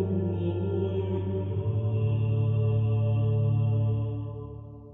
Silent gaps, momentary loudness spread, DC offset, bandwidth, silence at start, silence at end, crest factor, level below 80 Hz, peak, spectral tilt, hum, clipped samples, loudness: none; 9 LU; under 0.1%; 3.6 kHz; 0 s; 0 s; 10 dB; -50 dBFS; -16 dBFS; -10.5 dB/octave; none; under 0.1%; -28 LUFS